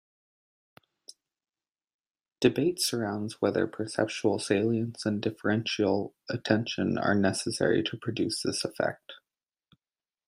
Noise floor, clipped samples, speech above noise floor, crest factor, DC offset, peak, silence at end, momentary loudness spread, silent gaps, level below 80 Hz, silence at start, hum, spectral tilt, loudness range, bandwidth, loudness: under -90 dBFS; under 0.1%; over 62 dB; 22 dB; under 0.1%; -8 dBFS; 1.1 s; 6 LU; none; -70 dBFS; 2.4 s; none; -5 dB/octave; 3 LU; 15.5 kHz; -29 LUFS